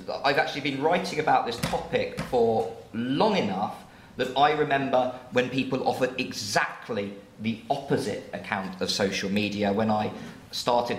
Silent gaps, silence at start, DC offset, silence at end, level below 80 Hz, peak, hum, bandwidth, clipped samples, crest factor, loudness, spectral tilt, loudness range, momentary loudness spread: none; 0 s; under 0.1%; 0 s; -58 dBFS; -6 dBFS; none; 16 kHz; under 0.1%; 20 dB; -27 LUFS; -4.5 dB/octave; 3 LU; 9 LU